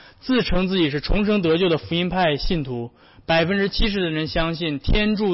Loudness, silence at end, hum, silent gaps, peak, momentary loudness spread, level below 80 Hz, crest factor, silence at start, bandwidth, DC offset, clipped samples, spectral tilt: -21 LUFS; 0 s; none; none; -10 dBFS; 6 LU; -30 dBFS; 12 dB; 0.25 s; 5.8 kHz; under 0.1%; under 0.1%; -9 dB/octave